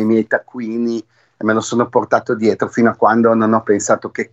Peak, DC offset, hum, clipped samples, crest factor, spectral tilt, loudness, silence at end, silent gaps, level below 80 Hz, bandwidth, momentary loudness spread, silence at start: 0 dBFS; under 0.1%; none; under 0.1%; 16 dB; -5.5 dB/octave; -16 LUFS; 0.05 s; none; -64 dBFS; 8.2 kHz; 8 LU; 0 s